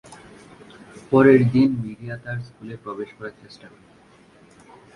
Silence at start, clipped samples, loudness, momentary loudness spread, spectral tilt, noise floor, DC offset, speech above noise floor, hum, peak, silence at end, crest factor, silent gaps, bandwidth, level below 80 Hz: 0.1 s; under 0.1%; -19 LUFS; 23 LU; -8.5 dB/octave; -52 dBFS; under 0.1%; 32 dB; none; -2 dBFS; 1.3 s; 20 dB; none; 11 kHz; -56 dBFS